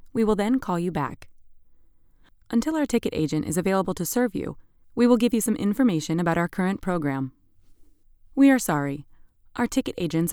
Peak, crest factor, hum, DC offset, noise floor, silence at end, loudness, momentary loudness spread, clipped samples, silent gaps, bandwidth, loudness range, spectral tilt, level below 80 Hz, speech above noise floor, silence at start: -6 dBFS; 18 dB; none; under 0.1%; -55 dBFS; 0 s; -24 LUFS; 12 LU; under 0.1%; none; 19 kHz; 4 LU; -5.5 dB/octave; -50 dBFS; 32 dB; 0.05 s